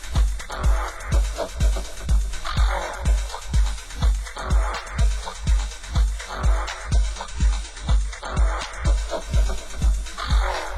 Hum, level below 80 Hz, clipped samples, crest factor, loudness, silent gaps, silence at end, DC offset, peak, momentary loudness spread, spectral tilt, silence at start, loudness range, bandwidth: none; -22 dBFS; under 0.1%; 12 dB; -25 LUFS; none; 0 s; under 0.1%; -8 dBFS; 3 LU; -4.5 dB/octave; 0 s; 1 LU; 12.5 kHz